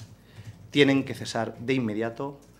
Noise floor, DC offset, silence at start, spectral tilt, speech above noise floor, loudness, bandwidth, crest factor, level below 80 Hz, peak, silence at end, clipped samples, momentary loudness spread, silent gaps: -46 dBFS; under 0.1%; 0 s; -5.5 dB/octave; 20 dB; -26 LUFS; 14.5 kHz; 24 dB; -62 dBFS; -4 dBFS; 0.25 s; under 0.1%; 25 LU; none